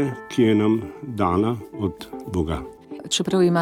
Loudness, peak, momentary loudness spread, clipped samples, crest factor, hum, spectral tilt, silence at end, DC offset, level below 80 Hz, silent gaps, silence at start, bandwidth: -23 LUFS; -6 dBFS; 14 LU; under 0.1%; 16 dB; none; -5.5 dB/octave; 0 s; under 0.1%; -44 dBFS; none; 0 s; 15.5 kHz